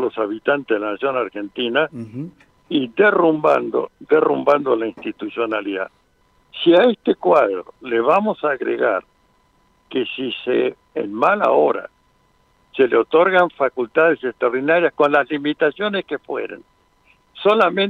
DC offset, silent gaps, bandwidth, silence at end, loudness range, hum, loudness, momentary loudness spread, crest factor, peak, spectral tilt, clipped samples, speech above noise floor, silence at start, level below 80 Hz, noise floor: under 0.1%; none; 6.8 kHz; 0 s; 4 LU; none; -18 LUFS; 12 LU; 16 dB; -2 dBFS; -7 dB/octave; under 0.1%; 41 dB; 0 s; -64 dBFS; -59 dBFS